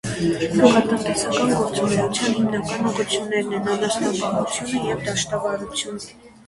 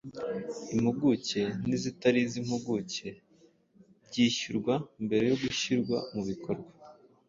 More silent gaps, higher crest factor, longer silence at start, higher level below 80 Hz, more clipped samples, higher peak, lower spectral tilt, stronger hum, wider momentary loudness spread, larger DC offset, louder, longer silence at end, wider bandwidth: neither; about the same, 20 dB vs 20 dB; about the same, 0.05 s vs 0.05 s; first, -52 dBFS vs -64 dBFS; neither; first, 0 dBFS vs -10 dBFS; about the same, -4 dB/octave vs -5 dB/octave; neither; about the same, 8 LU vs 10 LU; neither; first, -21 LUFS vs -31 LUFS; second, 0.2 s vs 0.35 s; first, 11.5 kHz vs 7.6 kHz